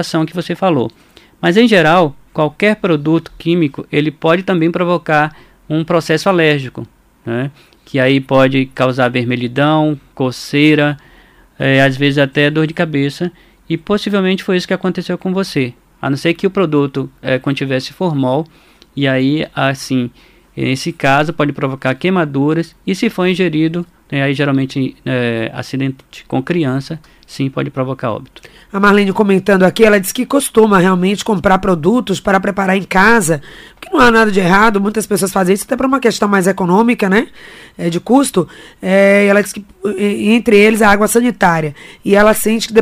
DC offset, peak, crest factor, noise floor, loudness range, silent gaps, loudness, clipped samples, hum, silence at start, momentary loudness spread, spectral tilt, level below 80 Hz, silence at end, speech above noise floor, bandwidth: under 0.1%; 0 dBFS; 14 dB; -45 dBFS; 5 LU; none; -13 LUFS; under 0.1%; none; 0 s; 12 LU; -5.5 dB/octave; -42 dBFS; 0 s; 32 dB; 16 kHz